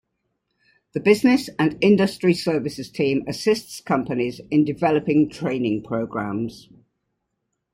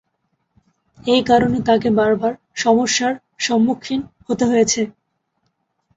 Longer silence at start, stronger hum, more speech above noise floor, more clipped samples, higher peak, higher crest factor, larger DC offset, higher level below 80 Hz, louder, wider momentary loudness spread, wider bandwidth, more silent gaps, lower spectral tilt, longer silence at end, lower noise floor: about the same, 0.95 s vs 1.05 s; neither; about the same, 56 dB vs 53 dB; neither; about the same, -2 dBFS vs -2 dBFS; about the same, 20 dB vs 16 dB; neither; second, -58 dBFS vs -50 dBFS; second, -21 LUFS vs -18 LUFS; about the same, 9 LU vs 10 LU; first, 16 kHz vs 8 kHz; neither; first, -6 dB/octave vs -4 dB/octave; about the same, 1.15 s vs 1.05 s; first, -77 dBFS vs -70 dBFS